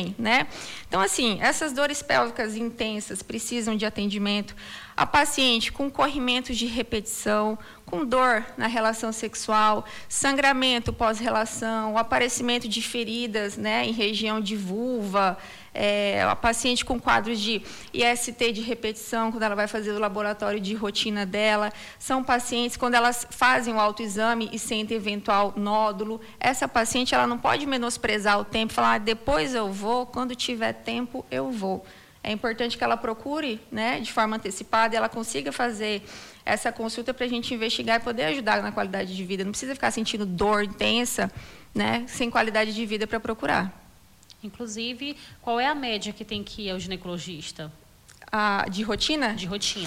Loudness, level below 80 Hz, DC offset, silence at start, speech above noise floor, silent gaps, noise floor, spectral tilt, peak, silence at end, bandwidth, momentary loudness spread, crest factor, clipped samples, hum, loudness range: -25 LUFS; -50 dBFS; under 0.1%; 0 s; 28 dB; none; -53 dBFS; -3 dB/octave; -8 dBFS; 0 s; 16.5 kHz; 9 LU; 18 dB; under 0.1%; none; 5 LU